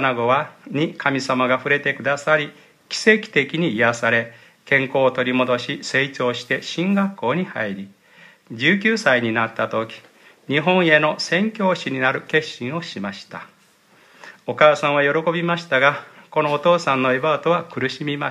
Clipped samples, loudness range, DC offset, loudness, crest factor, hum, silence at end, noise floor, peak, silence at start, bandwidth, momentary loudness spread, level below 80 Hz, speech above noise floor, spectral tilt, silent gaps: under 0.1%; 3 LU; under 0.1%; -19 LUFS; 20 dB; none; 0 s; -55 dBFS; 0 dBFS; 0 s; 12.5 kHz; 11 LU; -70 dBFS; 35 dB; -5 dB/octave; none